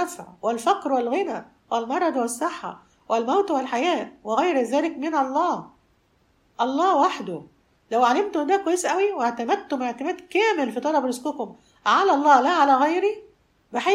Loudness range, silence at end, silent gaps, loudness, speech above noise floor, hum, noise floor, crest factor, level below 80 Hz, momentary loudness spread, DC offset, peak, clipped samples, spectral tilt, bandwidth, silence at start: 4 LU; 0 s; none; -23 LUFS; 41 dB; none; -63 dBFS; 18 dB; -70 dBFS; 12 LU; under 0.1%; -4 dBFS; under 0.1%; -3.5 dB/octave; 15.5 kHz; 0 s